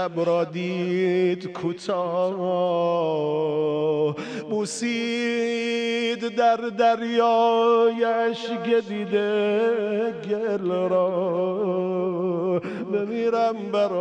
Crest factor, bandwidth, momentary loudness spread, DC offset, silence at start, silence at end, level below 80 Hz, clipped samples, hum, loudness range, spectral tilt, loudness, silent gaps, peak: 14 dB; 10 kHz; 6 LU; under 0.1%; 0 s; 0 s; -74 dBFS; under 0.1%; none; 3 LU; -5.5 dB/octave; -23 LUFS; none; -10 dBFS